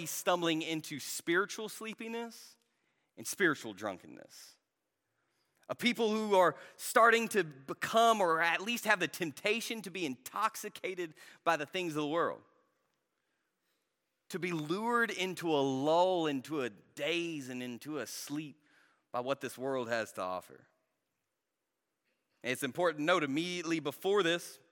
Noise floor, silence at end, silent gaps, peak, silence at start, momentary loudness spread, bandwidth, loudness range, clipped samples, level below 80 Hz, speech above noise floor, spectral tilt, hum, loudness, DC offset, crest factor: -87 dBFS; 0.15 s; none; -12 dBFS; 0 s; 14 LU; 17.5 kHz; 10 LU; under 0.1%; -90 dBFS; 53 dB; -3.5 dB/octave; none; -33 LUFS; under 0.1%; 24 dB